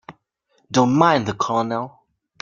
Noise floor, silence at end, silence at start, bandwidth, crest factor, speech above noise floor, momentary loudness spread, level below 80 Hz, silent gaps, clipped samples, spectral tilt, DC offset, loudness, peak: -66 dBFS; 0.5 s; 0.1 s; 7.4 kHz; 20 dB; 47 dB; 12 LU; -58 dBFS; none; under 0.1%; -5.5 dB/octave; under 0.1%; -19 LUFS; -2 dBFS